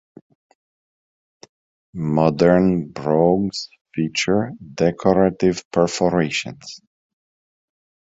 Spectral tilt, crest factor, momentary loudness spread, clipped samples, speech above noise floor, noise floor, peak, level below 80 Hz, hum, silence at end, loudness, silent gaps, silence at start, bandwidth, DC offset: -6 dB/octave; 20 dB; 15 LU; under 0.1%; over 71 dB; under -90 dBFS; -2 dBFS; -50 dBFS; none; 1.25 s; -19 LUFS; 3.81-3.85 s, 5.65-5.71 s; 1.95 s; 8 kHz; under 0.1%